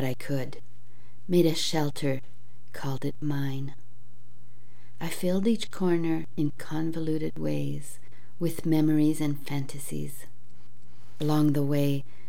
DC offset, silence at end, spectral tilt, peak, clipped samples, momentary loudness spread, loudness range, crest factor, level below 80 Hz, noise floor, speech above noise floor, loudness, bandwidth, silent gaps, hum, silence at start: 4%; 0.25 s; -6.5 dB/octave; -12 dBFS; under 0.1%; 14 LU; 4 LU; 18 dB; -64 dBFS; -57 dBFS; 29 dB; -29 LUFS; 17 kHz; none; none; 0 s